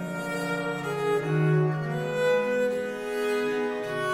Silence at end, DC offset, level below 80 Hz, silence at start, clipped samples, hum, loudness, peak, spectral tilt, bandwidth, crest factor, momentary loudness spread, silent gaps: 0 s; under 0.1%; -64 dBFS; 0 s; under 0.1%; none; -27 LUFS; -14 dBFS; -6.5 dB/octave; 16 kHz; 14 dB; 6 LU; none